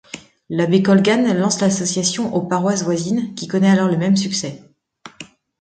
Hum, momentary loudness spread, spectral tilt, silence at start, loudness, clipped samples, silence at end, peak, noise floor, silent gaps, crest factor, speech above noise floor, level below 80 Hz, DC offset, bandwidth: none; 14 LU; -5 dB/octave; 0.15 s; -17 LUFS; under 0.1%; 0.35 s; -2 dBFS; -44 dBFS; none; 16 dB; 27 dB; -60 dBFS; under 0.1%; 9.2 kHz